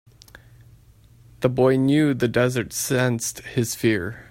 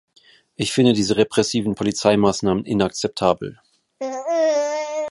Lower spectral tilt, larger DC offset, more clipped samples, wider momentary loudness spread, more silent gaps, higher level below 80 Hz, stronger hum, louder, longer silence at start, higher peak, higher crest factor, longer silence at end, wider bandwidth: about the same, -5.5 dB/octave vs -5 dB/octave; neither; neither; about the same, 8 LU vs 9 LU; neither; about the same, -54 dBFS vs -52 dBFS; neither; about the same, -22 LUFS vs -20 LUFS; first, 1.4 s vs 0.6 s; about the same, -4 dBFS vs -2 dBFS; about the same, 18 dB vs 20 dB; about the same, 0.05 s vs 0 s; first, 16.5 kHz vs 11.5 kHz